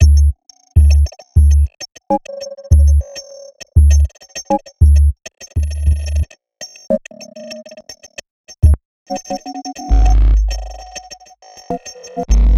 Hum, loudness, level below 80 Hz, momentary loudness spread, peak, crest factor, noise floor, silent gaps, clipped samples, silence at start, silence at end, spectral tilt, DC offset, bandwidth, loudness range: none; -16 LUFS; -14 dBFS; 21 LU; 0 dBFS; 14 dB; -41 dBFS; 8.30-8.44 s, 8.85-9.06 s; under 0.1%; 0 s; 0 s; -6.5 dB/octave; under 0.1%; 12 kHz; 7 LU